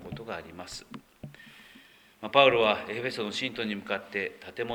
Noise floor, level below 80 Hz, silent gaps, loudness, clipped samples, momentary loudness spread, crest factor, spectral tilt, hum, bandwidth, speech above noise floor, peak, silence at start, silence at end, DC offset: -56 dBFS; -64 dBFS; none; -28 LUFS; under 0.1%; 25 LU; 26 dB; -4 dB/octave; none; 19.5 kHz; 27 dB; -4 dBFS; 0 s; 0 s; under 0.1%